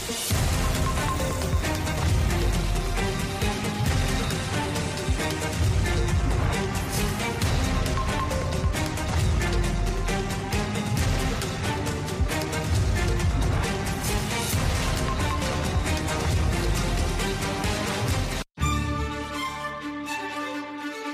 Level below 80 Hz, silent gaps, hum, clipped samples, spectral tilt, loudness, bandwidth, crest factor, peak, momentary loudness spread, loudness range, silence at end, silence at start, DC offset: -30 dBFS; none; none; under 0.1%; -4.5 dB/octave; -26 LUFS; 15.5 kHz; 14 dB; -12 dBFS; 4 LU; 1 LU; 0 s; 0 s; under 0.1%